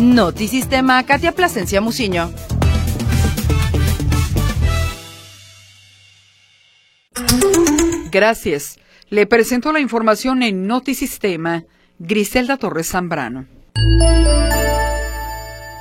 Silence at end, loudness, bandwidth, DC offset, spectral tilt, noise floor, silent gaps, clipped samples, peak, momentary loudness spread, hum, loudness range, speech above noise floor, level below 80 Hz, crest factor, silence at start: 0 s; -16 LUFS; 16.5 kHz; under 0.1%; -5 dB/octave; -55 dBFS; none; under 0.1%; 0 dBFS; 12 LU; none; 5 LU; 39 dB; -24 dBFS; 16 dB; 0 s